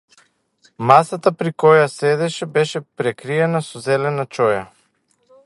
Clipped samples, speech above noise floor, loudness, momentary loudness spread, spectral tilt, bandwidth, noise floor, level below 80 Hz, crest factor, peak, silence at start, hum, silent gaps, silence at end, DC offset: under 0.1%; 46 dB; -18 LUFS; 10 LU; -5.5 dB/octave; 11.5 kHz; -63 dBFS; -64 dBFS; 18 dB; 0 dBFS; 0.8 s; none; none; 0.8 s; under 0.1%